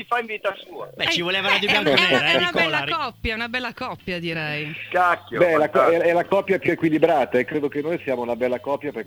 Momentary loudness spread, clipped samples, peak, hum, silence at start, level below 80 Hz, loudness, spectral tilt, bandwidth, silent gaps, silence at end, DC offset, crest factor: 10 LU; under 0.1%; 0 dBFS; none; 0 s; -50 dBFS; -21 LUFS; -4.5 dB/octave; over 20 kHz; none; 0.05 s; under 0.1%; 22 dB